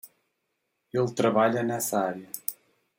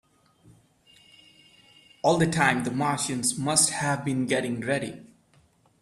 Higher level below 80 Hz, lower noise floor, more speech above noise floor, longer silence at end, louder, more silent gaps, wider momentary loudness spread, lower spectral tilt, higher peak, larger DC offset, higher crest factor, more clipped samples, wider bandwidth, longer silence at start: second, -74 dBFS vs -62 dBFS; first, -79 dBFS vs -62 dBFS; first, 53 dB vs 37 dB; second, 0.45 s vs 0.8 s; about the same, -27 LUFS vs -25 LUFS; neither; first, 11 LU vs 8 LU; first, -5 dB/octave vs -3.5 dB/octave; about the same, -8 dBFS vs -6 dBFS; neither; about the same, 22 dB vs 22 dB; neither; about the same, 16.5 kHz vs 15.5 kHz; second, 0.05 s vs 2.05 s